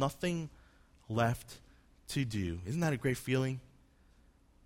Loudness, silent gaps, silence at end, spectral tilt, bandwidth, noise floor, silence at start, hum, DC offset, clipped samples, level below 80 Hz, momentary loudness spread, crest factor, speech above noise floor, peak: -35 LUFS; none; 1.05 s; -6 dB/octave; 16.5 kHz; -65 dBFS; 0 s; none; under 0.1%; under 0.1%; -58 dBFS; 15 LU; 18 dB; 30 dB; -18 dBFS